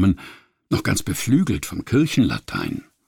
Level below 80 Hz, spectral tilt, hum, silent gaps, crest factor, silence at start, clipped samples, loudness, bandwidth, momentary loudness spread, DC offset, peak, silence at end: -42 dBFS; -5.5 dB/octave; none; none; 14 dB; 0 s; under 0.1%; -22 LUFS; 18.5 kHz; 9 LU; under 0.1%; -8 dBFS; 0.25 s